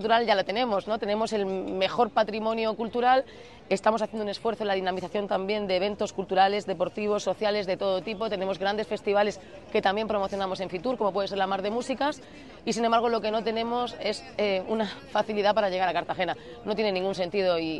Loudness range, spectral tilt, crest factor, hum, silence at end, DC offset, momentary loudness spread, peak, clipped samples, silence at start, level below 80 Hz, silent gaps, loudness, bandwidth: 2 LU; -4.5 dB/octave; 18 dB; none; 0 s; 0.1%; 7 LU; -10 dBFS; under 0.1%; 0 s; -60 dBFS; none; -27 LUFS; 11.5 kHz